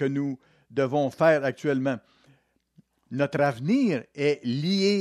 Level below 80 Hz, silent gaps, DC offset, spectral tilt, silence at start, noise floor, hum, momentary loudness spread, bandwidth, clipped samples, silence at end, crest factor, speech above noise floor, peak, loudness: -72 dBFS; none; under 0.1%; -6.5 dB/octave; 0 s; -63 dBFS; none; 12 LU; 12.5 kHz; under 0.1%; 0 s; 18 dB; 38 dB; -8 dBFS; -26 LUFS